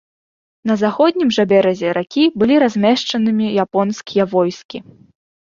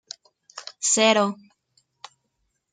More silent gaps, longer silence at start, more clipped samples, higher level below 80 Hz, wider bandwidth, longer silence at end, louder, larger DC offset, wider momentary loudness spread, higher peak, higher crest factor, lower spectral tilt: first, 4.65-4.69 s vs none; about the same, 0.65 s vs 0.55 s; neither; first, -58 dBFS vs -76 dBFS; second, 7.4 kHz vs 9.6 kHz; second, 0.6 s vs 1.4 s; first, -16 LUFS vs -20 LUFS; neither; second, 8 LU vs 24 LU; about the same, -2 dBFS vs -4 dBFS; second, 14 dB vs 22 dB; first, -6 dB/octave vs -2 dB/octave